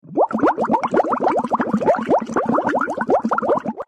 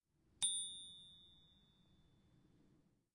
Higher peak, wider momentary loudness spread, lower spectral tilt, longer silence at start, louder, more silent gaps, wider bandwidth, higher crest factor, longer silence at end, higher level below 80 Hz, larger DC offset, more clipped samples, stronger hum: first, -6 dBFS vs -24 dBFS; second, 3 LU vs 22 LU; first, -7 dB/octave vs 1.5 dB/octave; second, 0.05 s vs 0.4 s; first, -19 LUFS vs -41 LUFS; neither; second, 10 kHz vs 11.5 kHz; second, 12 dB vs 28 dB; second, 0.05 s vs 1.8 s; first, -56 dBFS vs -82 dBFS; neither; neither; neither